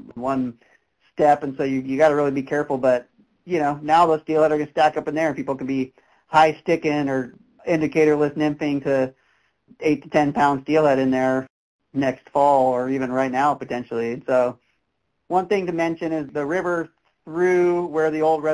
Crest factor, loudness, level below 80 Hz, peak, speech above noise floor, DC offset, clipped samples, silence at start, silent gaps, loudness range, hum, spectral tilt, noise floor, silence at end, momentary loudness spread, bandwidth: 16 dB; -21 LUFS; -60 dBFS; -6 dBFS; 54 dB; under 0.1%; under 0.1%; 0 s; 11.50-11.79 s; 3 LU; none; -6.5 dB/octave; -74 dBFS; 0 s; 9 LU; 11 kHz